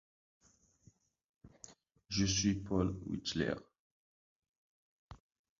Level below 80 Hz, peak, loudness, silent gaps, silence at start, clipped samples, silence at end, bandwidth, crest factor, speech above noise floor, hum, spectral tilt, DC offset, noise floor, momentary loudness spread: -56 dBFS; -20 dBFS; -36 LUFS; 3.79-4.42 s, 4.48-5.09 s; 1.45 s; under 0.1%; 0.45 s; 7.4 kHz; 22 dB; 34 dB; none; -5 dB/octave; under 0.1%; -69 dBFS; 24 LU